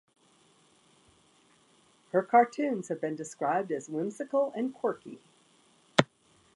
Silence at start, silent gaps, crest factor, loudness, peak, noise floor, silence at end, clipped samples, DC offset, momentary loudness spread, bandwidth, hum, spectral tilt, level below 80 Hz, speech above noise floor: 2.15 s; none; 30 dB; -30 LUFS; -2 dBFS; -65 dBFS; 0.5 s; under 0.1%; under 0.1%; 12 LU; 11.5 kHz; none; -5 dB/octave; -76 dBFS; 35 dB